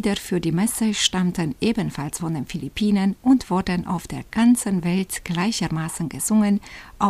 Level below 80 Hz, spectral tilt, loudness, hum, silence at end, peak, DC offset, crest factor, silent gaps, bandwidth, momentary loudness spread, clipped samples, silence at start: -46 dBFS; -4.5 dB/octave; -22 LUFS; none; 0 s; -4 dBFS; under 0.1%; 18 dB; none; 15.5 kHz; 9 LU; under 0.1%; 0 s